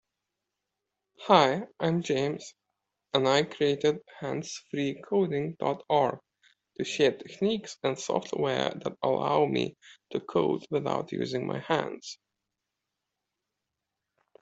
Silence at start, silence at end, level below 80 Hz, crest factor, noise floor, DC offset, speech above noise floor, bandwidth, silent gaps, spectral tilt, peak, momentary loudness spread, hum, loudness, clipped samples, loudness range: 1.2 s; 2.3 s; -72 dBFS; 24 dB; -86 dBFS; under 0.1%; 58 dB; 8.2 kHz; none; -5 dB/octave; -4 dBFS; 12 LU; none; -29 LUFS; under 0.1%; 5 LU